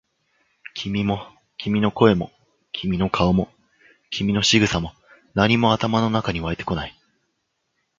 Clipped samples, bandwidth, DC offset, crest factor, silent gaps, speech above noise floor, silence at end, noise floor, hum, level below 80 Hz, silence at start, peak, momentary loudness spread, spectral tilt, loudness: under 0.1%; 7.6 kHz; under 0.1%; 22 dB; none; 54 dB; 1.1 s; -74 dBFS; none; -44 dBFS; 0.75 s; 0 dBFS; 16 LU; -5 dB/octave; -21 LUFS